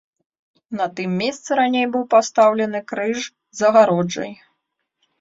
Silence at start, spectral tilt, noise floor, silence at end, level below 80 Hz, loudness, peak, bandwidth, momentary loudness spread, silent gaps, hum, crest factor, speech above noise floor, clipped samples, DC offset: 0.7 s; -5 dB/octave; -75 dBFS; 0.85 s; -66 dBFS; -19 LUFS; -2 dBFS; 7.8 kHz; 13 LU; none; none; 18 dB; 57 dB; under 0.1%; under 0.1%